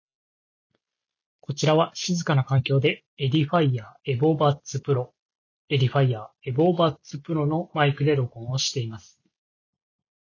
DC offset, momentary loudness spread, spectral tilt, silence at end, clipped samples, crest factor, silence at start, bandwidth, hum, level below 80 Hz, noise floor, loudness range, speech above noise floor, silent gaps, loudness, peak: under 0.1%; 10 LU; -6 dB/octave; 1.3 s; under 0.1%; 18 dB; 1.5 s; 7.4 kHz; none; -62 dBFS; -88 dBFS; 2 LU; 64 dB; 3.06-3.17 s, 5.22-5.29 s, 5.35-5.68 s; -24 LUFS; -6 dBFS